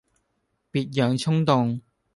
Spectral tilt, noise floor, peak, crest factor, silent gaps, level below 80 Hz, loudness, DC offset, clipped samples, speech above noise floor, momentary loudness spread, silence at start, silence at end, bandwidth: -7 dB/octave; -74 dBFS; -6 dBFS; 20 dB; none; -62 dBFS; -24 LUFS; under 0.1%; under 0.1%; 52 dB; 9 LU; 0.75 s; 0.35 s; 11.5 kHz